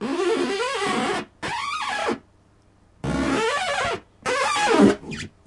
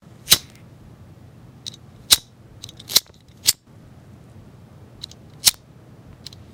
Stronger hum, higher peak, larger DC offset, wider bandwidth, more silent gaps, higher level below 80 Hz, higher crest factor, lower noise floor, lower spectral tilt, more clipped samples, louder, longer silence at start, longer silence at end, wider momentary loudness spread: neither; second, -4 dBFS vs 0 dBFS; neither; second, 11.5 kHz vs 18 kHz; neither; first, -48 dBFS vs -54 dBFS; second, 20 dB vs 26 dB; first, -57 dBFS vs -47 dBFS; first, -4 dB/octave vs 0.5 dB/octave; neither; second, -23 LUFS vs -18 LUFS; second, 0 s vs 0.25 s; second, 0.2 s vs 1 s; second, 11 LU vs 24 LU